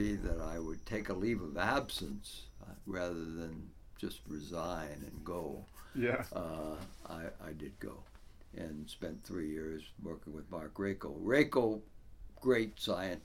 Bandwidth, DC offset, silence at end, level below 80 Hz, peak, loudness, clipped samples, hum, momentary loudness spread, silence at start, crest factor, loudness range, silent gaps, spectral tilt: 17 kHz; under 0.1%; 0 s; -52 dBFS; -14 dBFS; -39 LUFS; under 0.1%; none; 15 LU; 0 s; 24 dB; 9 LU; none; -5.5 dB/octave